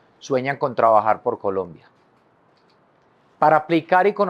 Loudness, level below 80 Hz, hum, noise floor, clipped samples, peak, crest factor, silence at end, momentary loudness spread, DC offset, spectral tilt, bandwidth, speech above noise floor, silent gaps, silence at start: -20 LUFS; -72 dBFS; none; -58 dBFS; under 0.1%; -2 dBFS; 18 dB; 0 s; 9 LU; under 0.1%; -6.5 dB/octave; 7.4 kHz; 39 dB; none; 0.25 s